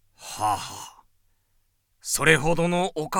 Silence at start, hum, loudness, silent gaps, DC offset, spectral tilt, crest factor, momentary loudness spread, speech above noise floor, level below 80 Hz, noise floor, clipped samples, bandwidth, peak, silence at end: 0.2 s; none; -23 LUFS; none; under 0.1%; -3.5 dB/octave; 22 dB; 19 LU; 45 dB; -46 dBFS; -68 dBFS; under 0.1%; 18 kHz; -4 dBFS; 0 s